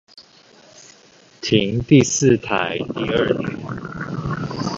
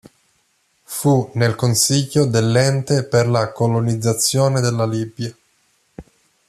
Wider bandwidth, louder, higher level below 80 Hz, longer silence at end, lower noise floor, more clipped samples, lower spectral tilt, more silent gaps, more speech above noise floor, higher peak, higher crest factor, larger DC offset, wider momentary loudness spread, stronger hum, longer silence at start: second, 8 kHz vs 14 kHz; second, -20 LUFS vs -17 LUFS; first, -46 dBFS vs -54 dBFS; second, 0 s vs 0.45 s; second, -50 dBFS vs -63 dBFS; neither; about the same, -5 dB/octave vs -5 dB/octave; neither; second, 32 dB vs 46 dB; about the same, 0 dBFS vs -2 dBFS; about the same, 20 dB vs 16 dB; neither; first, 14 LU vs 7 LU; neither; second, 0.15 s vs 0.9 s